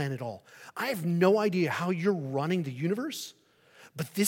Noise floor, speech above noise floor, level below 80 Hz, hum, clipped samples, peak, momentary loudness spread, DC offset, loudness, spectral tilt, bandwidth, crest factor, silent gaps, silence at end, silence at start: -57 dBFS; 28 dB; -78 dBFS; none; under 0.1%; -12 dBFS; 17 LU; under 0.1%; -30 LUFS; -6 dB/octave; 17 kHz; 18 dB; none; 0 s; 0 s